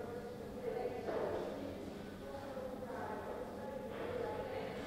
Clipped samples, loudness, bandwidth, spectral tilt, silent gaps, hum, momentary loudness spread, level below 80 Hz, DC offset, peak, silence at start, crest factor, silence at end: under 0.1%; -44 LUFS; 16 kHz; -6 dB/octave; none; none; 7 LU; -64 dBFS; under 0.1%; -28 dBFS; 0 s; 14 dB; 0 s